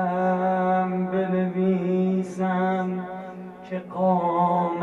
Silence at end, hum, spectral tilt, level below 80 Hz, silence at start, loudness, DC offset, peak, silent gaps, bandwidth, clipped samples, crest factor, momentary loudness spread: 0 s; none; -9 dB/octave; -66 dBFS; 0 s; -24 LUFS; under 0.1%; -12 dBFS; none; 7.4 kHz; under 0.1%; 12 dB; 12 LU